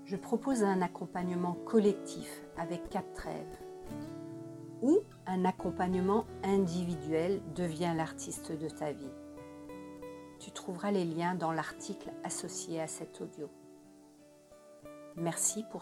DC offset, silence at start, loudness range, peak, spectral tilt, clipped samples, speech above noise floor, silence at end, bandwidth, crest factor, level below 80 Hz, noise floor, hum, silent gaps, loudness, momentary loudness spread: under 0.1%; 0 s; 7 LU; -16 dBFS; -5.5 dB/octave; under 0.1%; 25 dB; 0 s; 16 kHz; 20 dB; -62 dBFS; -59 dBFS; none; none; -35 LUFS; 17 LU